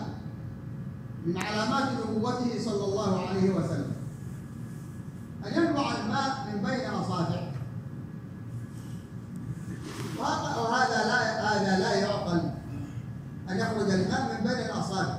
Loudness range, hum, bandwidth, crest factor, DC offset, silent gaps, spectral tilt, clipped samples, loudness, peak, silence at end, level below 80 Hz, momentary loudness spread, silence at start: 7 LU; none; 15 kHz; 18 dB; under 0.1%; none; -5.5 dB/octave; under 0.1%; -30 LUFS; -12 dBFS; 0 s; -56 dBFS; 14 LU; 0 s